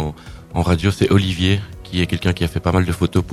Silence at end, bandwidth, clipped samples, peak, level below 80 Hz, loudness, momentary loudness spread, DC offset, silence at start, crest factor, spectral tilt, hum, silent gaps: 0 s; 14 kHz; under 0.1%; 0 dBFS; -38 dBFS; -19 LUFS; 10 LU; under 0.1%; 0 s; 18 dB; -6.5 dB/octave; none; none